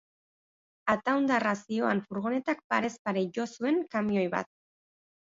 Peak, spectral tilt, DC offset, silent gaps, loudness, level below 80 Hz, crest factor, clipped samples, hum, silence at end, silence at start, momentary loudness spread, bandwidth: -12 dBFS; -6 dB/octave; under 0.1%; 2.64-2.70 s, 2.99-3.05 s; -30 LUFS; -70 dBFS; 20 dB; under 0.1%; none; 0.75 s; 0.85 s; 6 LU; 7.8 kHz